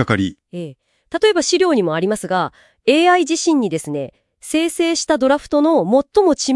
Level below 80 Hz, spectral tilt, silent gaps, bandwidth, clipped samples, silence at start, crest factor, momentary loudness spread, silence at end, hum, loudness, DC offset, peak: -54 dBFS; -4 dB/octave; none; 12 kHz; under 0.1%; 0 s; 16 dB; 13 LU; 0 s; none; -17 LUFS; under 0.1%; 0 dBFS